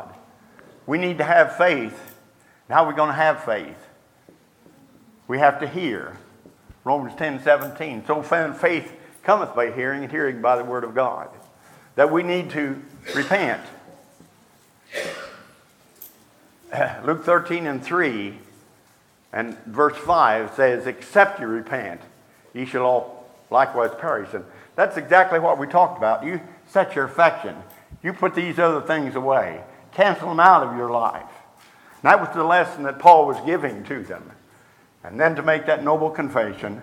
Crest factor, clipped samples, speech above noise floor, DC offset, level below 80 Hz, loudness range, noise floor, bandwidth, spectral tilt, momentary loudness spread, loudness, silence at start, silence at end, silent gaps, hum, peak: 22 dB; under 0.1%; 37 dB; under 0.1%; -64 dBFS; 7 LU; -57 dBFS; 17.5 kHz; -6 dB/octave; 16 LU; -20 LUFS; 0 s; 0 s; none; none; 0 dBFS